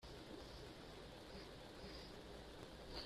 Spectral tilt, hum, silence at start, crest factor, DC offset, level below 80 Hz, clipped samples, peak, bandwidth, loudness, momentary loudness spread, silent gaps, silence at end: -4.5 dB/octave; none; 0 s; 20 dB; under 0.1%; -62 dBFS; under 0.1%; -36 dBFS; 14.5 kHz; -56 LUFS; 2 LU; none; 0 s